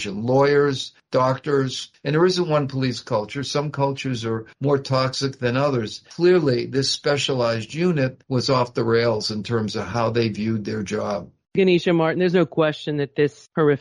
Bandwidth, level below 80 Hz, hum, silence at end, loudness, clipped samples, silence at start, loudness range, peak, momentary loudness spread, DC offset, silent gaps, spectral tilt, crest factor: 11 kHz; -58 dBFS; none; 0 s; -22 LUFS; under 0.1%; 0 s; 2 LU; -6 dBFS; 8 LU; under 0.1%; none; -6 dB/octave; 14 dB